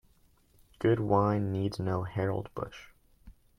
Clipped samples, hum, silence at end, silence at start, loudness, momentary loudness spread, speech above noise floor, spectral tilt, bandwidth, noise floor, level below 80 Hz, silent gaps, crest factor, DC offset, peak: under 0.1%; none; 0.3 s; 0.8 s; -31 LUFS; 14 LU; 35 dB; -8.5 dB/octave; 11 kHz; -65 dBFS; -58 dBFS; none; 20 dB; under 0.1%; -12 dBFS